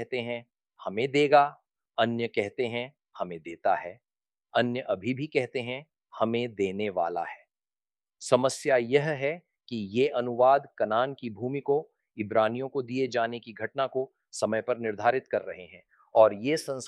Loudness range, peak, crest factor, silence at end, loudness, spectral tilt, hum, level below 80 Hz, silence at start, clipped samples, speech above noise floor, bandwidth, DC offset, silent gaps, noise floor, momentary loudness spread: 4 LU; -6 dBFS; 22 dB; 0 s; -28 LUFS; -5 dB/octave; none; -76 dBFS; 0 s; under 0.1%; over 62 dB; 12.5 kHz; under 0.1%; none; under -90 dBFS; 15 LU